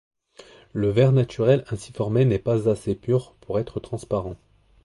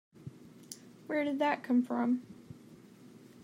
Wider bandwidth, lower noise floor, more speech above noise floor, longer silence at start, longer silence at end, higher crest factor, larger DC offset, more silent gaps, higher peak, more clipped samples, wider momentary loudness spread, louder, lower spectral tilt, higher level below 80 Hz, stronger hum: second, 11.5 kHz vs 16 kHz; second, -50 dBFS vs -55 dBFS; first, 28 dB vs 24 dB; first, 0.75 s vs 0.2 s; first, 0.5 s vs 0.05 s; about the same, 18 dB vs 18 dB; neither; neither; first, -6 dBFS vs -16 dBFS; neither; second, 13 LU vs 23 LU; first, -23 LUFS vs -32 LUFS; first, -8 dB/octave vs -5.5 dB/octave; first, -48 dBFS vs -80 dBFS; neither